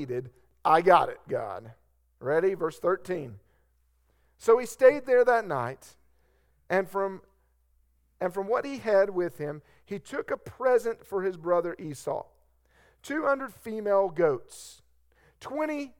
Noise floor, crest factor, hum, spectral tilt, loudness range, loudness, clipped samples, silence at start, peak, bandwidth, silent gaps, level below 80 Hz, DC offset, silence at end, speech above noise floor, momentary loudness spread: -68 dBFS; 22 dB; none; -5.5 dB/octave; 6 LU; -27 LUFS; under 0.1%; 0 s; -6 dBFS; 17 kHz; none; -66 dBFS; under 0.1%; 0.1 s; 41 dB; 16 LU